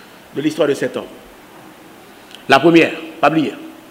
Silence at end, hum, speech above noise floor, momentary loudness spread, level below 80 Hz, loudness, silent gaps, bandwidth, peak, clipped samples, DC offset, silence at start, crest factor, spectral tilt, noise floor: 0.2 s; none; 27 dB; 21 LU; -58 dBFS; -15 LUFS; none; 16 kHz; 0 dBFS; under 0.1%; under 0.1%; 0.35 s; 18 dB; -5.5 dB/octave; -41 dBFS